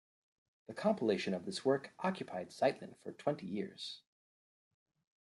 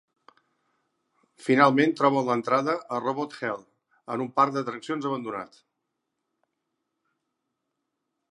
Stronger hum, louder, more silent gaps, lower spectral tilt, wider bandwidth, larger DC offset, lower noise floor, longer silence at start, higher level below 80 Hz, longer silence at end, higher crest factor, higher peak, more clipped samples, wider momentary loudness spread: neither; second, -38 LUFS vs -25 LUFS; neither; about the same, -5.5 dB/octave vs -6 dB/octave; about the same, 11.5 kHz vs 11 kHz; neither; first, under -90 dBFS vs -81 dBFS; second, 0.7 s vs 1.4 s; about the same, -84 dBFS vs -80 dBFS; second, 1.35 s vs 2.85 s; about the same, 22 dB vs 26 dB; second, -18 dBFS vs -4 dBFS; neither; about the same, 13 LU vs 15 LU